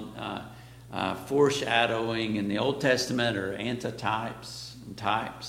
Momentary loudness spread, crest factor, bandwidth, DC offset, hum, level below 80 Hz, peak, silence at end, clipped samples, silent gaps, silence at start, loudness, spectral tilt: 15 LU; 22 dB; 16.5 kHz; under 0.1%; none; -58 dBFS; -8 dBFS; 0 s; under 0.1%; none; 0 s; -28 LUFS; -4.5 dB/octave